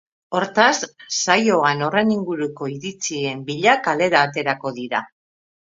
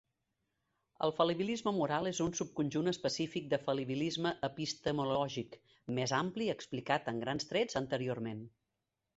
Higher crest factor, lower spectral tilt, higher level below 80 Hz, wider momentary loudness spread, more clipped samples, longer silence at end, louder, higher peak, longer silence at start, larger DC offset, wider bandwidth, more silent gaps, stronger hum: about the same, 20 dB vs 22 dB; about the same, -3.5 dB/octave vs -4.5 dB/octave; about the same, -66 dBFS vs -68 dBFS; first, 10 LU vs 7 LU; neither; about the same, 0.75 s vs 0.7 s; first, -20 LUFS vs -36 LUFS; first, 0 dBFS vs -16 dBFS; second, 0.3 s vs 1 s; neither; about the same, 7.8 kHz vs 8 kHz; neither; neither